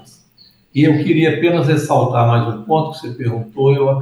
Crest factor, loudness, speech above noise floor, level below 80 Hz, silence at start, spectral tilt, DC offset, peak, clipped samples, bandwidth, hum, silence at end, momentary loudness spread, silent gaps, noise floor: 14 dB; -15 LUFS; 36 dB; -58 dBFS; 0.75 s; -7.5 dB/octave; under 0.1%; -2 dBFS; under 0.1%; 12.5 kHz; none; 0 s; 9 LU; none; -51 dBFS